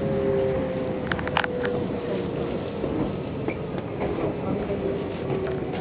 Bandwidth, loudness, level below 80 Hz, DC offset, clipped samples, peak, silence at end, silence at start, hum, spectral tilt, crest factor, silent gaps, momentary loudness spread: 5 kHz; -27 LUFS; -44 dBFS; under 0.1%; under 0.1%; -4 dBFS; 0 s; 0 s; none; -10.5 dB/octave; 22 dB; none; 5 LU